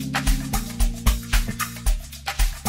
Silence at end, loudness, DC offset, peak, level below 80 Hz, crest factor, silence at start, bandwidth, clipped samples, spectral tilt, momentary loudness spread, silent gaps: 0 s; -26 LUFS; under 0.1%; -6 dBFS; -24 dBFS; 16 dB; 0 s; 16.5 kHz; under 0.1%; -3.5 dB/octave; 5 LU; none